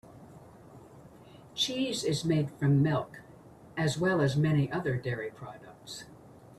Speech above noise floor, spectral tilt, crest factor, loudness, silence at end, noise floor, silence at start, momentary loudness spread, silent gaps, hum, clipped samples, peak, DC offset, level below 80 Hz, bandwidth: 23 dB; -5.5 dB/octave; 16 dB; -29 LUFS; 0.15 s; -53 dBFS; 0.1 s; 19 LU; none; none; under 0.1%; -16 dBFS; under 0.1%; -62 dBFS; 12.5 kHz